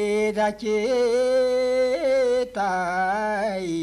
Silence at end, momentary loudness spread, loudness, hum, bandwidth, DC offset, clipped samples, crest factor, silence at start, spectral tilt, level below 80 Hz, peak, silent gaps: 0 s; 4 LU; -23 LUFS; none; 12 kHz; under 0.1%; under 0.1%; 10 dB; 0 s; -4.5 dB/octave; -54 dBFS; -12 dBFS; none